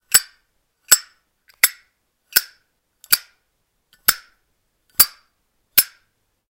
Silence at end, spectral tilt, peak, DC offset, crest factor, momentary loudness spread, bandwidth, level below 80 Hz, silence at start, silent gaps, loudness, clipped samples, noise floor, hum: 0.65 s; 2.5 dB/octave; 0 dBFS; under 0.1%; 24 dB; 4 LU; 17 kHz; -58 dBFS; 0.15 s; none; -17 LUFS; under 0.1%; -70 dBFS; none